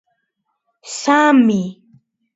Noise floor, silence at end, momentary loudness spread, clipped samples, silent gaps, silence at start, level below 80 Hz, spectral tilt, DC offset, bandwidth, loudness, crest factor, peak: -72 dBFS; 0.65 s; 18 LU; under 0.1%; none; 0.85 s; -66 dBFS; -5 dB/octave; under 0.1%; 8 kHz; -14 LUFS; 18 dB; 0 dBFS